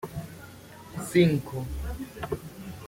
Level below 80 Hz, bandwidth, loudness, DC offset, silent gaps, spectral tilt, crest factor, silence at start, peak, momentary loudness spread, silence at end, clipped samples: -44 dBFS; 16.5 kHz; -29 LUFS; under 0.1%; none; -6.5 dB/octave; 22 dB; 0 s; -8 dBFS; 22 LU; 0 s; under 0.1%